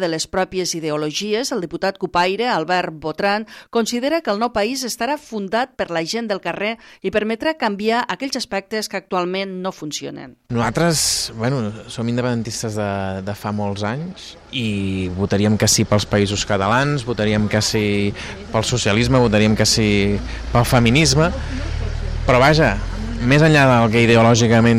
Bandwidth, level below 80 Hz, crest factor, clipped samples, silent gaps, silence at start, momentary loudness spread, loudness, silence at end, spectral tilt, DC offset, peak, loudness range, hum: 16 kHz; -34 dBFS; 18 dB; under 0.1%; none; 0 s; 12 LU; -18 LUFS; 0 s; -4.5 dB/octave; under 0.1%; 0 dBFS; 6 LU; none